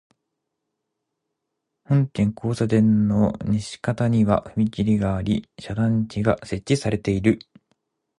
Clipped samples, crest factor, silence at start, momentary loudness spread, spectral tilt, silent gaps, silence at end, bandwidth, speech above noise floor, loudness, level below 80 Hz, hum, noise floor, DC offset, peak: under 0.1%; 18 dB; 1.9 s; 7 LU; -7.5 dB/octave; none; 0.8 s; 11 kHz; 59 dB; -22 LUFS; -46 dBFS; none; -80 dBFS; under 0.1%; -4 dBFS